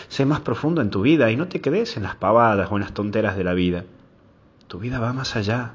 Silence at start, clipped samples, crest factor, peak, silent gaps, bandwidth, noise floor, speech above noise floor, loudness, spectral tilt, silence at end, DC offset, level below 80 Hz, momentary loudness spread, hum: 0 s; under 0.1%; 18 dB; -4 dBFS; none; 7.6 kHz; -53 dBFS; 32 dB; -21 LUFS; -7 dB/octave; 0 s; under 0.1%; -44 dBFS; 9 LU; none